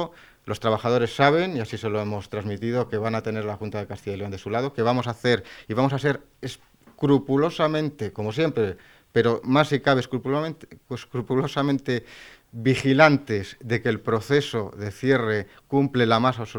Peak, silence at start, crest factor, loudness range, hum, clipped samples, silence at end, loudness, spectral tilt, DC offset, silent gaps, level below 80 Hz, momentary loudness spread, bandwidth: 0 dBFS; 0 s; 24 dB; 4 LU; none; under 0.1%; 0 s; -24 LUFS; -6.5 dB/octave; under 0.1%; none; -56 dBFS; 13 LU; 17.5 kHz